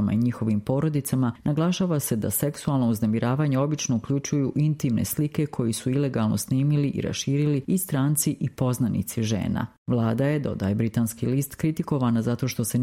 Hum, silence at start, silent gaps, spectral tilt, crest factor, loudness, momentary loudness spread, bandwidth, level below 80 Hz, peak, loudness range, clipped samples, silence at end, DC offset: none; 0 s; 9.78-9.86 s; -6 dB/octave; 14 dB; -25 LUFS; 3 LU; 16.5 kHz; -54 dBFS; -10 dBFS; 1 LU; under 0.1%; 0 s; under 0.1%